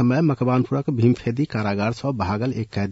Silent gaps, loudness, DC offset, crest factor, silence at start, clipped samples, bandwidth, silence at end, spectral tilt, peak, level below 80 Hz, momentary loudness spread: none; -22 LUFS; under 0.1%; 16 dB; 0 s; under 0.1%; 8 kHz; 0 s; -8.5 dB/octave; -6 dBFS; -54 dBFS; 5 LU